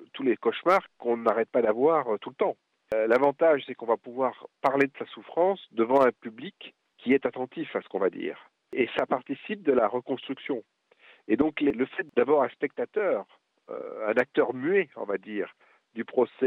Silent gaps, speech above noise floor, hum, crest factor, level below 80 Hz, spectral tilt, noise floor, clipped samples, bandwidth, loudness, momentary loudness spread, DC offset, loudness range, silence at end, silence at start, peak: none; 32 dB; none; 18 dB; -70 dBFS; -7 dB/octave; -58 dBFS; under 0.1%; 7.8 kHz; -27 LUFS; 14 LU; under 0.1%; 4 LU; 0 s; 0 s; -10 dBFS